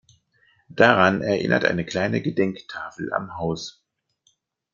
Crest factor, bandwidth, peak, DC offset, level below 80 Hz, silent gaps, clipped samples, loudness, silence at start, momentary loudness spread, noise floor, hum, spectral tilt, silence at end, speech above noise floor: 22 dB; 7.4 kHz; -2 dBFS; under 0.1%; -60 dBFS; none; under 0.1%; -22 LUFS; 0.7 s; 17 LU; -67 dBFS; none; -6 dB/octave; 1.05 s; 46 dB